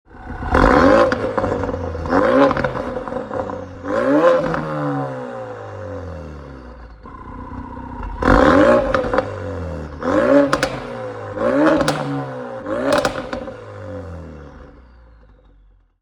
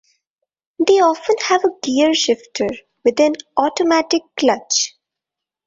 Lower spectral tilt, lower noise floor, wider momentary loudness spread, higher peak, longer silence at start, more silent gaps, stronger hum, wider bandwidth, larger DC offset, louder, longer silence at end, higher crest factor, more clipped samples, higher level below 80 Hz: first, -6.5 dB/octave vs -2 dB/octave; second, -51 dBFS vs -85 dBFS; first, 21 LU vs 6 LU; about the same, 0 dBFS vs -2 dBFS; second, 0.1 s vs 0.8 s; neither; neither; first, 19 kHz vs 7.8 kHz; neither; about the same, -18 LUFS vs -17 LUFS; first, 1.2 s vs 0.8 s; about the same, 18 dB vs 16 dB; neither; first, -34 dBFS vs -60 dBFS